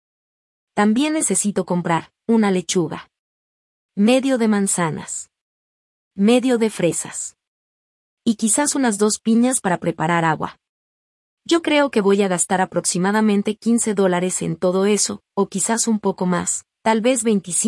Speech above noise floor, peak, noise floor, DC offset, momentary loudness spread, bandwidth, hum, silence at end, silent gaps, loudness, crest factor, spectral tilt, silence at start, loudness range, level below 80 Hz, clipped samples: over 72 dB; -4 dBFS; under -90 dBFS; under 0.1%; 8 LU; 12 kHz; none; 0 s; 3.19-3.89 s, 5.41-6.11 s, 7.47-8.17 s, 10.69-11.37 s; -19 LUFS; 16 dB; -4 dB/octave; 0.75 s; 3 LU; -64 dBFS; under 0.1%